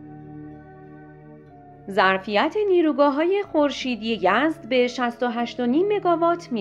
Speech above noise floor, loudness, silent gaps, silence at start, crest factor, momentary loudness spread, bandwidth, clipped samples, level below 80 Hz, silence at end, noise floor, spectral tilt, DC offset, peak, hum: 25 dB; -21 LUFS; none; 0 s; 18 dB; 18 LU; 11 kHz; under 0.1%; -60 dBFS; 0 s; -46 dBFS; -5 dB/octave; under 0.1%; -4 dBFS; none